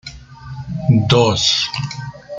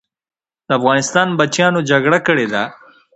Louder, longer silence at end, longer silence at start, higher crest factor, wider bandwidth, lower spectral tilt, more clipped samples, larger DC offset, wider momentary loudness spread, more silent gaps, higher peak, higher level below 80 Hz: about the same, -15 LUFS vs -15 LUFS; second, 0 s vs 0.4 s; second, 0.05 s vs 0.7 s; about the same, 16 dB vs 16 dB; about the same, 9.2 kHz vs 8.8 kHz; about the same, -5 dB/octave vs -4.5 dB/octave; neither; neither; first, 20 LU vs 7 LU; neither; about the same, -2 dBFS vs 0 dBFS; first, -42 dBFS vs -60 dBFS